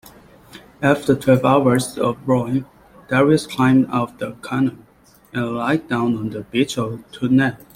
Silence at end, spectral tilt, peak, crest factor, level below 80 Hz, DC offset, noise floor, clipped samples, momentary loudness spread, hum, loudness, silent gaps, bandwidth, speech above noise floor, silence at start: 0.2 s; -6.5 dB/octave; -2 dBFS; 18 dB; -52 dBFS; under 0.1%; -45 dBFS; under 0.1%; 10 LU; none; -19 LUFS; none; 16 kHz; 27 dB; 0.55 s